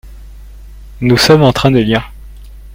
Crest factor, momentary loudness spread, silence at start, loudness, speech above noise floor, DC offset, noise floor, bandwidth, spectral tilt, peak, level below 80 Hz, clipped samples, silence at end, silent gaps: 14 dB; 10 LU; 0.05 s; -10 LUFS; 23 dB; under 0.1%; -32 dBFS; 16.5 kHz; -5.5 dB/octave; 0 dBFS; -32 dBFS; 0.1%; 0 s; none